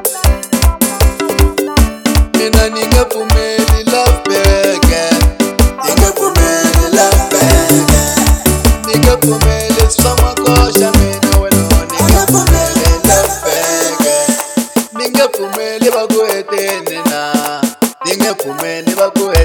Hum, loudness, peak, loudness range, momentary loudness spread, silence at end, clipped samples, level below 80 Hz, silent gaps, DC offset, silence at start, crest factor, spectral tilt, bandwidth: none; -11 LUFS; 0 dBFS; 4 LU; 6 LU; 0 s; 0.2%; -16 dBFS; none; under 0.1%; 0 s; 10 dB; -4.5 dB/octave; 19.5 kHz